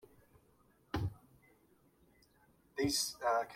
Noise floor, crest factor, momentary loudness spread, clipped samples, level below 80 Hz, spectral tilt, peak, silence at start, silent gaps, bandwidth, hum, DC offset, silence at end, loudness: -70 dBFS; 20 dB; 10 LU; under 0.1%; -60 dBFS; -3.5 dB/octave; -22 dBFS; 0.95 s; none; 16.5 kHz; none; under 0.1%; 0 s; -37 LUFS